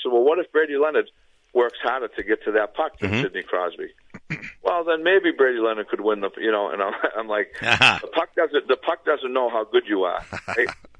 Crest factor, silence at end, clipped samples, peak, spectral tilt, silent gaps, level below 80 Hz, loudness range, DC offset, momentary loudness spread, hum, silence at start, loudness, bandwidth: 20 dB; 0.25 s; under 0.1%; -2 dBFS; -5 dB/octave; none; -58 dBFS; 4 LU; under 0.1%; 9 LU; none; 0 s; -22 LUFS; 10 kHz